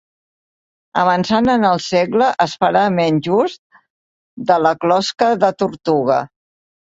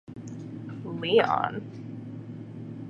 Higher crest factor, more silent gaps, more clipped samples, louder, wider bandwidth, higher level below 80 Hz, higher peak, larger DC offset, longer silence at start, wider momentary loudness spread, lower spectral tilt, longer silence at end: second, 16 dB vs 22 dB; first, 3.59-3.70 s, 3.90-4.37 s vs none; neither; first, -16 LUFS vs -28 LUFS; about the same, 8 kHz vs 7.6 kHz; first, -54 dBFS vs -68 dBFS; first, 0 dBFS vs -8 dBFS; neither; first, 0.95 s vs 0.1 s; second, 6 LU vs 18 LU; about the same, -5.5 dB/octave vs -6.5 dB/octave; first, 0.55 s vs 0 s